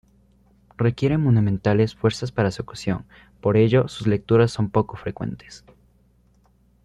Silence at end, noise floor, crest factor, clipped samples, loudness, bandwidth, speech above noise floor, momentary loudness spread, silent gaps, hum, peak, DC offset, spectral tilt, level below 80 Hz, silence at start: 1.25 s; -59 dBFS; 18 dB; under 0.1%; -22 LUFS; 10.5 kHz; 38 dB; 11 LU; none; 60 Hz at -45 dBFS; -4 dBFS; under 0.1%; -7.5 dB/octave; -50 dBFS; 0.8 s